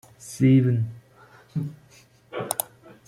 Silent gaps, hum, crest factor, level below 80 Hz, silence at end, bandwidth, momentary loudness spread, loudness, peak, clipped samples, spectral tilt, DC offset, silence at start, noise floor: none; none; 22 dB; -62 dBFS; 0.45 s; 16.5 kHz; 19 LU; -24 LUFS; -4 dBFS; under 0.1%; -6.5 dB/octave; under 0.1%; 0.2 s; -55 dBFS